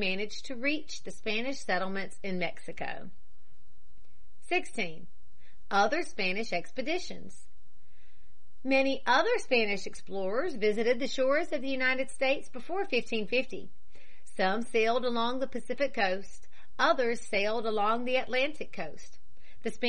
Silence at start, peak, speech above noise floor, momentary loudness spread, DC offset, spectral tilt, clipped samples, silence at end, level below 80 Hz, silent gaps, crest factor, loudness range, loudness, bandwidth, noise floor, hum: 0 s; -12 dBFS; 32 dB; 13 LU; 3%; -4 dB/octave; under 0.1%; 0 s; -62 dBFS; none; 20 dB; 7 LU; -31 LUFS; 10.5 kHz; -63 dBFS; none